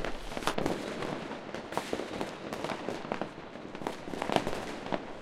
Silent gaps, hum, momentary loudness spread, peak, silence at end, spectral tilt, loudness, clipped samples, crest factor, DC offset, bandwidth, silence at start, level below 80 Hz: none; none; 8 LU; -6 dBFS; 0 s; -4.5 dB/octave; -36 LUFS; under 0.1%; 30 dB; under 0.1%; 16 kHz; 0 s; -52 dBFS